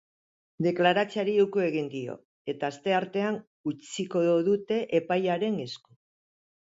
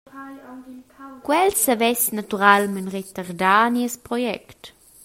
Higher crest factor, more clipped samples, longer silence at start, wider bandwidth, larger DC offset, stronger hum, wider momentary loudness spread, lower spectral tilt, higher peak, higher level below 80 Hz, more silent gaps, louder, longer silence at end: about the same, 20 dB vs 22 dB; neither; first, 0.6 s vs 0.15 s; second, 8 kHz vs 16.5 kHz; neither; neither; second, 13 LU vs 23 LU; first, -6 dB/octave vs -3 dB/octave; second, -10 dBFS vs 0 dBFS; second, -74 dBFS vs -60 dBFS; first, 2.25-2.45 s, 3.47-3.64 s vs none; second, -28 LUFS vs -20 LUFS; first, 1 s vs 0.35 s